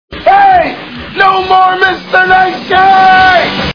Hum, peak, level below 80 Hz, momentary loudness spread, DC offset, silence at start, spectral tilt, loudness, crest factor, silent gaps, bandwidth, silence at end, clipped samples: none; 0 dBFS; -36 dBFS; 6 LU; under 0.1%; 0.1 s; -5 dB/octave; -7 LUFS; 8 dB; none; 5.4 kHz; 0 s; 2%